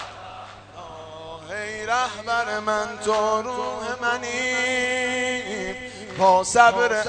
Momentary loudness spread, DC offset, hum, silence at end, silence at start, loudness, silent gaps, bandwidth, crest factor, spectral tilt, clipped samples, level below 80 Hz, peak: 22 LU; under 0.1%; none; 0 s; 0 s; -22 LUFS; none; 9.4 kHz; 22 dB; -2.5 dB/octave; under 0.1%; -56 dBFS; -2 dBFS